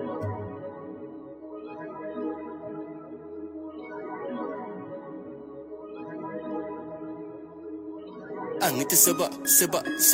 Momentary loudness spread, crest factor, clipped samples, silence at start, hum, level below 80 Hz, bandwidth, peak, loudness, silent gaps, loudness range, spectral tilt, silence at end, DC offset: 22 LU; 26 dB; under 0.1%; 0 s; none; -68 dBFS; 16.5 kHz; -4 dBFS; -26 LUFS; none; 14 LU; -2.5 dB/octave; 0 s; under 0.1%